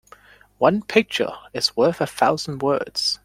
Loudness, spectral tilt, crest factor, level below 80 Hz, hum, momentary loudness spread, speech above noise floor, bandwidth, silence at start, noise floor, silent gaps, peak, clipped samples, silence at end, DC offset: -21 LUFS; -4 dB/octave; 20 dB; -58 dBFS; none; 5 LU; 29 dB; 16 kHz; 0.6 s; -50 dBFS; none; -2 dBFS; under 0.1%; 0.1 s; under 0.1%